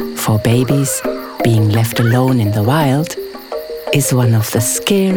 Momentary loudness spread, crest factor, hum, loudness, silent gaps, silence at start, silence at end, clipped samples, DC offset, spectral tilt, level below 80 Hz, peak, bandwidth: 10 LU; 14 dB; none; -14 LUFS; none; 0 s; 0 s; under 0.1%; 0.2%; -5.5 dB/octave; -46 dBFS; 0 dBFS; over 20 kHz